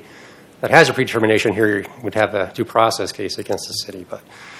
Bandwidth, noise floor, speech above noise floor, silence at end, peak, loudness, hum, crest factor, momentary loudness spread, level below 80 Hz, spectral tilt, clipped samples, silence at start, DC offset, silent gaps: 15.5 kHz; -43 dBFS; 25 dB; 0 s; 0 dBFS; -18 LUFS; none; 18 dB; 16 LU; -58 dBFS; -4.5 dB/octave; 0.1%; 0.15 s; under 0.1%; none